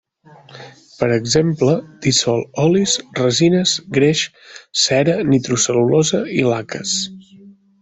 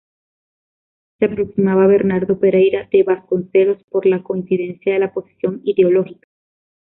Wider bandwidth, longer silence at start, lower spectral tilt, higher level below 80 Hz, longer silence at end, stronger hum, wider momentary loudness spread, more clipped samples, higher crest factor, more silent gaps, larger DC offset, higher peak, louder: first, 8.4 kHz vs 3.8 kHz; second, 0.55 s vs 1.2 s; second, -4 dB/octave vs -12.5 dB/octave; about the same, -52 dBFS vs -56 dBFS; second, 0.3 s vs 0.7 s; neither; about the same, 6 LU vs 8 LU; neither; about the same, 16 dB vs 14 dB; second, none vs 3.84-3.88 s; neither; about the same, -2 dBFS vs -2 dBFS; about the same, -16 LUFS vs -16 LUFS